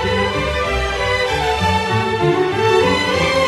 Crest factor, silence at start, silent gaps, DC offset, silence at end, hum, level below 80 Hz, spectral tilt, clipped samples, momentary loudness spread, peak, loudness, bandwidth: 14 dB; 0 s; none; under 0.1%; 0 s; none; -30 dBFS; -5 dB/octave; under 0.1%; 4 LU; -4 dBFS; -16 LUFS; 13 kHz